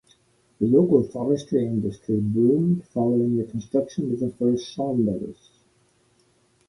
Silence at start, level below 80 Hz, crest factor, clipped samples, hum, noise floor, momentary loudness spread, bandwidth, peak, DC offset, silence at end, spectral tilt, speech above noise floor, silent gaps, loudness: 0.6 s; -58 dBFS; 20 dB; under 0.1%; none; -63 dBFS; 7 LU; 11.5 kHz; -4 dBFS; under 0.1%; 1.35 s; -9 dB/octave; 41 dB; none; -23 LUFS